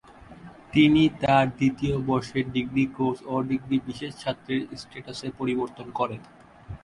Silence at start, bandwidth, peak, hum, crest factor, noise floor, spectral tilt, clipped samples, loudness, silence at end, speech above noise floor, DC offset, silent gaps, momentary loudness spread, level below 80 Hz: 0.1 s; 11 kHz; -6 dBFS; none; 20 dB; -46 dBFS; -6.5 dB/octave; under 0.1%; -25 LUFS; 0.05 s; 21 dB; under 0.1%; none; 15 LU; -52 dBFS